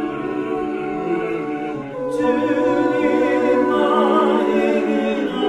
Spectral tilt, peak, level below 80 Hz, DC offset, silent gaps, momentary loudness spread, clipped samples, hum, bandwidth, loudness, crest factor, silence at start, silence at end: -6.5 dB/octave; -4 dBFS; -52 dBFS; under 0.1%; none; 8 LU; under 0.1%; none; 11.5 kHz; -19 LUFS; 14 dB; 0 s; 0 s